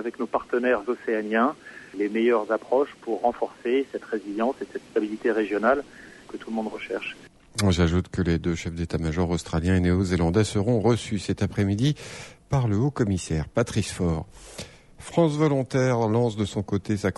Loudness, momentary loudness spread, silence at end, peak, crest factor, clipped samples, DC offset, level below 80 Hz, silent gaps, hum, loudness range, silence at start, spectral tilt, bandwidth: -25 LUFS; 12 LU; 0.05 s; -8 dBFS; 16 dB; under 0.1%; under 0.1%; -44 dBFS; none; none; 3 LU; 0 s; -6.5 dB/octave; 11.5 kHz